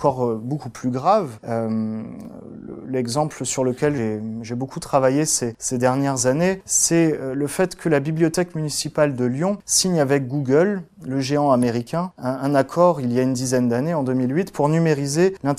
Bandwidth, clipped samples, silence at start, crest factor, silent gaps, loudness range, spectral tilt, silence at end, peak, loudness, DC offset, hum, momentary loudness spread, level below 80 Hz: 15.5 kHz; under 0.1%; 0 s; 18 dB; none; 5 LU; -5 dB/octave; 0 s; -4 dBFS; -21 LUFS; under 0.1%; none; 10 LU; -54 dBFS